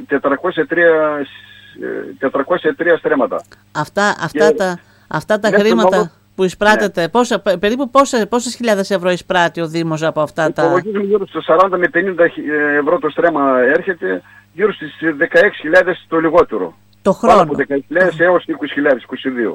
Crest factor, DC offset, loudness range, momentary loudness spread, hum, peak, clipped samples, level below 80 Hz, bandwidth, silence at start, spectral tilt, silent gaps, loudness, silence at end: 14 dB; under 0.1%; 3 LU; 9 LU; none; 0 dBFS; under 0.1%; -50 dBFS; 16 kHz; 0 s; -5 dB/octave; none; -15 LUFS; 0 s